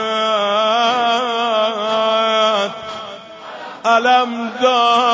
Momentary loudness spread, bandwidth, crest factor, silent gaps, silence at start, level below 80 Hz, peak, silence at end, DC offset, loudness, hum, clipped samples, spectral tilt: 17 LU; 8 kHz; 14 dB; none; 0 s; -66 dBFS; -2 dBFS; 0 s; under 0.1%; -15 LUFS; none; under 0.1%; -2.5 dB/octave